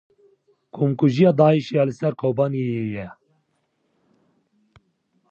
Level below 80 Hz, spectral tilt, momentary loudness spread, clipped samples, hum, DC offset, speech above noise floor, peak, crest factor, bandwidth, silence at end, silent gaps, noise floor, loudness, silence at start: -62 dBFS; -8.5 dB/octave; 15 LU; under 0.1%; none; under 0.1%; 51 dB; -4 dBFS; 20 dB; 7.2 kHz; 2.2 s; none; -70 dBFS; -20 LUFS; 0.75 s